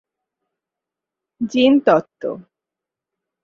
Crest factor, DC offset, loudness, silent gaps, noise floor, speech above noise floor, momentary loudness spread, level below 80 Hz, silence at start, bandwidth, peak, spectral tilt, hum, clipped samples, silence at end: 20 dB; under 0.1%; -16 LUFS; none; -86 dBFS; 70 dB; 15 LU; -66 dBFS; 1.4 s; 7 kHz; -2 dBFS; -6 dB/octave; none; under 0.1%; 1.05 s